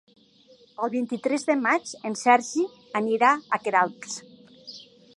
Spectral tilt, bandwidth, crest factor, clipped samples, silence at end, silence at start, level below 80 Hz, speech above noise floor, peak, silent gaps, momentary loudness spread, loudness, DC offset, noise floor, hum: -3.5 dB/octave; 11.5 kHz; 22 dB; under 0.1%; 0.35 s; 0.8 s; -80 dBFS; 32 dB; -4 dBFS; none; 21 LU; -24 LUFS; under 0.1%; -56 dBFS; none